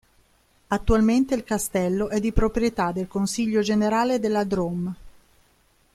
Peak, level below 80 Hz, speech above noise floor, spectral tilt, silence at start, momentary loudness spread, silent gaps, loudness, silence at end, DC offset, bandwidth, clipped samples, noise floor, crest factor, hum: -4 dBFS; -36 dBFS; 39 dB; -5.5 dB/octave; 0.7 s; 7 LU; none; -23 LUFS; 0.85 s; under 0.1%; 15 kHz; under 0.1%; -62 dBFS; 20 dB; none